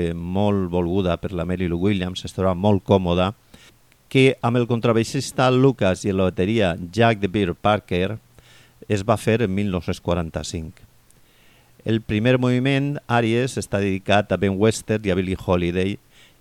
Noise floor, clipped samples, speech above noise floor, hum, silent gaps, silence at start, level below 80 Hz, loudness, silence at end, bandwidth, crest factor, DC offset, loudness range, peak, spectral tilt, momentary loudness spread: -55 dBFS; under 0.1%; 34 dB; none; none; 0 s; -46 dBFS; -21 LUFS; 0.45 s; 15 kHz; 18 dB; under 0.1%; 5 LU; -4 dBFS; -6.5 dB/octave; 8 LU